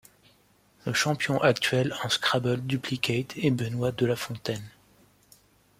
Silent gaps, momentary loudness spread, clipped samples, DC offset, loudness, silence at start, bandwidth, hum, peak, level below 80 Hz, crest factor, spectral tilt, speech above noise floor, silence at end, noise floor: none; 9 LU; under 0.1%; under 0.1%; -27 LUFS; 0.85 s; 16 kHz; 50 Hz at -60 dBFS; -6 dBFS; -62 dBFS; 22 dB; -4.5 dB/octave; 36 dB; 1.1 s; -63 dBFS